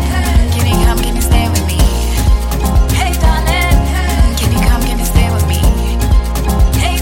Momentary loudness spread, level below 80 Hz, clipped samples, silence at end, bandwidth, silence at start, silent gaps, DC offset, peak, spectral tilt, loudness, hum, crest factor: 2 LU; -12 dBFS; under 0.1%; 0 s; 17 kHz; 0 s; none; under 0.1%; 0 dBFS; -5 dB/octave; -13 LUFS; none; 10 dB